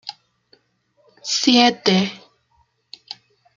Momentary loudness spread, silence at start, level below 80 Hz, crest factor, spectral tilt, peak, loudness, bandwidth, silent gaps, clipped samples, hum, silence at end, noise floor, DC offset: 23 LU; 0.05 s; -66 dBFS; 22 dB; -3.5 dB/octave; -2 dBFS; -17 LUFS; 7.4 kHz; none; under 0.1%; none; 1.4 s; -63 dBFS; under 0.1%